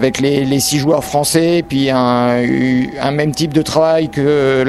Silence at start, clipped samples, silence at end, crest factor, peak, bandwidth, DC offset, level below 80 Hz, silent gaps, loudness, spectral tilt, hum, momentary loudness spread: 0 s; under 0.1%; 0 s; 14 dB; 0 dBFS; 14 kHz; under 0.1%; -42 dBFS; none; -14 LUFS; -5 dB/octave; none; 3 LU